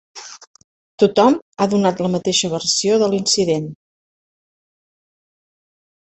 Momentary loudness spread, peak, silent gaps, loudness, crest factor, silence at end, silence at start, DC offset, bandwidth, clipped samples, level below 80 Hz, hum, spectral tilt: 16 LU; -2 dBFS; 0.47-0.54 s, 0.64-0.98 s, 1.42-1.52 s; -17 LUFS; 18 dB; 2.4 s; 0.15 s; under 0.1%; 8.4 kHz; under 0.1%; -60 dBFS; none; -4 dB/octave